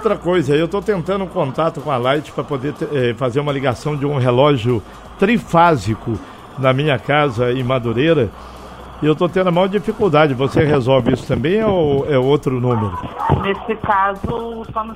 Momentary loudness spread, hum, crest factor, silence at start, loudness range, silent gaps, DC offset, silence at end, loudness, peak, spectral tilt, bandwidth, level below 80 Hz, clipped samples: 10 LU; none; 16 dB; 0 s; 3 LU; none; under 0.1%; 0 s; -17 LUFS; 0 dBFS; -7 dB/octave; 14 kHz; -40 dBFS; under 0.1%